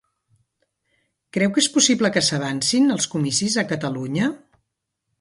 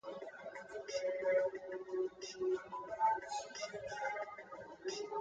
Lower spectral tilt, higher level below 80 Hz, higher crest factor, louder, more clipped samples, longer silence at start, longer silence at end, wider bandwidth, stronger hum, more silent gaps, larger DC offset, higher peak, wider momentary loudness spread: about the same, -3.5 dB/octave vs -3 dB/octave; first, -62 dBFS vs -78 dBFS; about the same, 20 dB vs 16 dB; first, -20 LUFS vs -41 LUFS; neither; first, 1.35 s vs 0.05 s; first, 0.85 s vs 0 s; first, 11.5 kHz vs 9.2 kHz; neither; neither; neither; first, -2 dBFS vs -24 dBFS; second, 9 LU vs 13 LU